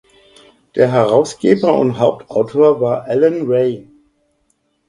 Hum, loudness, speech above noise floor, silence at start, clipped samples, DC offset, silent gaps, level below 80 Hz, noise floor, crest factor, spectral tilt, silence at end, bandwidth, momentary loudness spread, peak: none; -15 LUFS; 50 dB; 0.75 s; under 0.1%; under 0.1%; none; -56 dBFS; -64 dBFS; 16 dB; -7 dB/octave; 1.05 s; 11 kHz; 6 LU; 0 dBFS